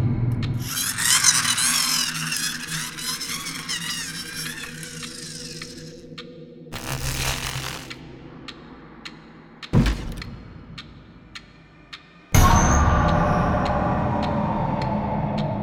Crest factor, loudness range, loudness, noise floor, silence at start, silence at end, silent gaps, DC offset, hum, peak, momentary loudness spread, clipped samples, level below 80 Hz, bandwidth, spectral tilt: 22 dB; 11 LU; -22 LUFS; -48 dBFS; 0 s; 0 s; none; under 0.1%; none; -2 dBFS; 23 LU; under 0.1%; -32 dBFS; 19 kHz; -3.5 dB/octave